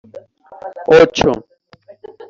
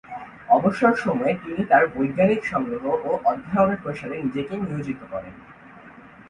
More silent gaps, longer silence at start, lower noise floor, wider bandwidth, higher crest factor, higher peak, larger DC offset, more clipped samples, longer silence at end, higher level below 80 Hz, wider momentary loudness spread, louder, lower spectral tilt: neither; about the same, 0.15 s vs 0.1 s; about the same, -45 dBFS vs -46 dBFS; second, 7.4 kHz vs 10.5 kHz; about the same, 16 dB vs 20 dB; first, 0 dBFS vs -4 dBFS; neither; neither; first, 0.9 s vs 0.2 s; first, -42 dBFS vs -56 dBFS; first, 23 LU vs 13 LU; first, -13 LUFS vs -22 LUFS; second, -5 dB/octave vs -8 dB/octave